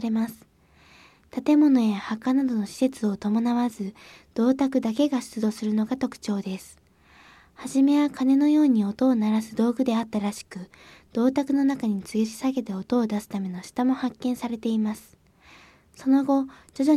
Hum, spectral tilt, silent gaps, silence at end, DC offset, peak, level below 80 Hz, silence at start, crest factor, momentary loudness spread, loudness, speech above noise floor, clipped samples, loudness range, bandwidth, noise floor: none; -6.5 dB/octave; none; 0 s; under 0.1%; -10 dBFS; -64 dBFS; 0 s; 16 dB; 12 LU; -24 LUFS; 33 dB; under 0.1%; 5 LU; 14 kHz; -57 dBFS